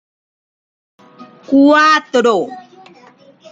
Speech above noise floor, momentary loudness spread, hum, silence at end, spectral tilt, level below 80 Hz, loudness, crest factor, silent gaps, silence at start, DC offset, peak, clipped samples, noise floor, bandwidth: 34 dB; 10 LU; none; 0.9 s; -4 dB/octave; -64 dBFS; -11 LUFS; 14 dB; none; 1.2 s; under 0.1%; -2 dBFS; under 0.1%; -45 dBFS; 7.8 kHz